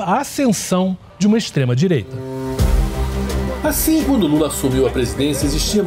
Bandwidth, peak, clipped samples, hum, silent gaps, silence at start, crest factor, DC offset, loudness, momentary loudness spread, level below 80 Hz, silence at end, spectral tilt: 16 kHz; -6 dBFS; under 0.1%; none; none; 0 s; 10 dB; under 0.1%; -18 LUFS; 6 LU; -26 dBFS; 0 s; -5.5 dB/octave